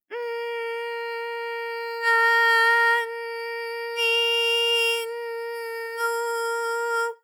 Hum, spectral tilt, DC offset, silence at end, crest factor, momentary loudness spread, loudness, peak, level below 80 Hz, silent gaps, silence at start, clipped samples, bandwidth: none; 4.5 dB/octave; under 0.1%; 0.1 s; 16 dB; 14 LU; -23 LUFS; -10 dBFS; under -90 dBFS; none; 0.1 s; under 0.1%; 19.5 kHz